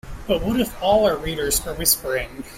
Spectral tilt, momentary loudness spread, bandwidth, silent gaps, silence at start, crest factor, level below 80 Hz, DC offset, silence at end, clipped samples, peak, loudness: -3 dB/octave; 7 LU; 16 kHz; none; 0.05 s; 18 dB; -36 dBFS; under 0.1%; 0 s; under 0.1%; -2 dBFS; -21 LUFS